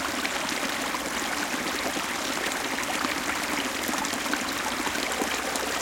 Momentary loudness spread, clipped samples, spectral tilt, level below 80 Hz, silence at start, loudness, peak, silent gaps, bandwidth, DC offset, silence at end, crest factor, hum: 1 LU; under 0.1%; -1.5 dB/octave; -54 dBFS; 0 s; -27 LUFS; -8 dBFS; none; 17 kHz; under 0.1%; 0 s; 20 dB; none